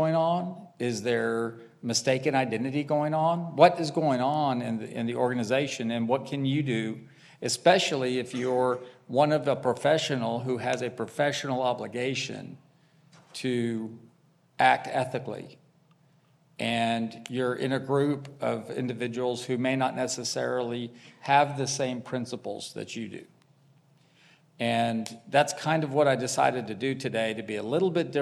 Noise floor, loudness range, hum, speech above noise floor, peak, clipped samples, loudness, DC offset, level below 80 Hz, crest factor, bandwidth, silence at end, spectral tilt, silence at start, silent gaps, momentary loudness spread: -63 dBFS; 5 LU; none; 36 dB; -4 dBFS; under 0.1%; -28 LUFS; under 0.1%; -78 dBFS; 24 dB; 14 kHz; 0 s; -5 dB/octave; 0 s; none; 12 LU